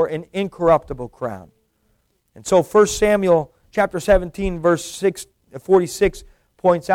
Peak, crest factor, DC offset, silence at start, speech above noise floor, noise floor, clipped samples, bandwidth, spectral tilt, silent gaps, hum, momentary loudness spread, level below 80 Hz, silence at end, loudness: -4 dBFS; 16 dB; under 0.1%; 0 s; 47 dB; -65 dBFS; under 0.1%; 16.5 kHz; -5 dB/octave; none; none; 15 LU; -38 dBFS; 0 s; -19 LUFS